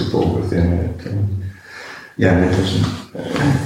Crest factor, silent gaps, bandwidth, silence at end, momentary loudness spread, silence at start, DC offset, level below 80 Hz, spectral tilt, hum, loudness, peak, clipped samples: 16 dB; none; 12.5 kHz; 0 s; 16 LU; 0 s; under 0.1%; -34 dBFS; -7 dB/octave; none; -19 LUFS; -2 dBFS; under 0.1%